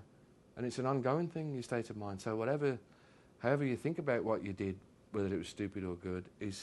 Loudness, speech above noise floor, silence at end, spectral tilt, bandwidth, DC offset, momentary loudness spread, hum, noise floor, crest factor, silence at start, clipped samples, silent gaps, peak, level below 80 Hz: -38 LUFS; 27 dB; 0 s; -7 dB/octave; 12 kHz; under 0.1%; 9 LU; none; -64 dBFS; 20 dB; 0 s; under 0.1%; none; -18 dBFS; -70 dBFS